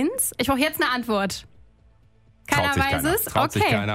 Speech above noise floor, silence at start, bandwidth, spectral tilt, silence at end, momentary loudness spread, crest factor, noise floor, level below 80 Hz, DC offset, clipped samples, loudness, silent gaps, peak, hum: 35 dB; 0 s; 16 kHz; -4 dB/octave; 0 s; 4 LU; 18 dB; -57 dBFS; -44 dBFS; under 0.1%; under 0.1%; -22 LUFS; none; -4 dBFS; none